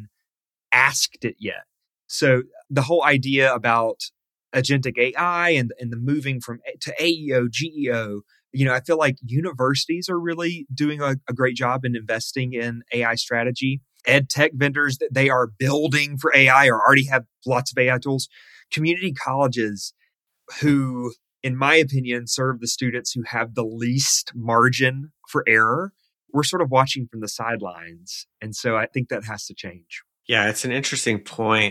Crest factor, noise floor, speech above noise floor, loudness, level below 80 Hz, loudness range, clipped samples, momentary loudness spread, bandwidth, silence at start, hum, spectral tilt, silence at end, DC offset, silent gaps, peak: 20 dB; -87 dBFS; 65 dB; -21 LUFS; -64 dBFS; 7 LU; under 0.1%; 15 LU; 14.5 kHz; 0 s; none; -4 dB/octave; 0 s; under 0.1%; none; -2 dBFS